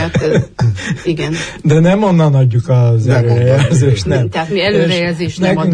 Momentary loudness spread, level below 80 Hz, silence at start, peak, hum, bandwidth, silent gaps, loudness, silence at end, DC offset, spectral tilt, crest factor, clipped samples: 7 LU; -38 dBFS; 0 s; 0 dBFS; none; 10 kHz; none; -13 LUFS; 0 s; under 0.1%; -7 dB/octave; 10 dB; under 0.1%